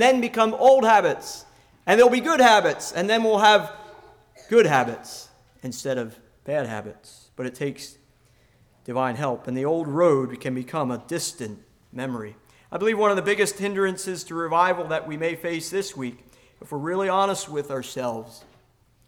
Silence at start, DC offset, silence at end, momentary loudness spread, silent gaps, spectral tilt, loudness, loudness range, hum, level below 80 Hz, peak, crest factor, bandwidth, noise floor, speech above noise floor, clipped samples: 0 s; under 0.1%; 0.7 s; 20 LU; none; -4 dB/octave; -22 LUFS; 12 LU; none; -64 dBFS; -6 dBFS; 18 dB; 18 kHz; -60 dBFS; 38 dB; under 0.1%